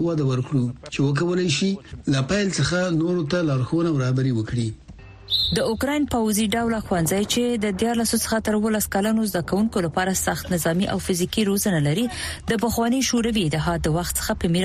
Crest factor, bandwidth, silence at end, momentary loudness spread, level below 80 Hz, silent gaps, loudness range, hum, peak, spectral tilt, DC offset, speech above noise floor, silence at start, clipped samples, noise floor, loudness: 14 dB; 15 kHz; 0 s; 4 LU; -42 dBFS; none; 1 LU; none; -8 dBFS; -5 dB/octave; under 0.1%; 21 dB; 0 s; under 0.1%; -42 dBFS; -22 LUFS